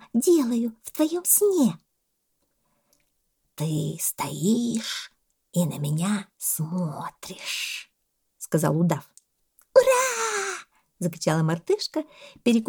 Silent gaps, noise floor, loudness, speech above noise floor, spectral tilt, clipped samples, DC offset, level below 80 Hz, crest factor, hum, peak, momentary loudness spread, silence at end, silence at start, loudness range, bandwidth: none; -75 dBFS; -25 LUFS; 51 dB; -4.5 dB/octave; under 0.1%; under 0.1%; -70 dBFS; 22 dB; none; -4 dBFS; 14 LU; 0 s; 0.15 s; 5 LU; over 20 kHz